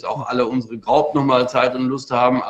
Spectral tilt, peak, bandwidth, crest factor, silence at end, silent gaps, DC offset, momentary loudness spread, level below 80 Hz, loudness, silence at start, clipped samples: -6.5 dB/octave; -2 dBFS; 8.4 kHz; 16 dB; 0 s; none; under 0.1%; 6 LU; -56 dBFS; -18 LUFS; 0.05 s; under 0.1%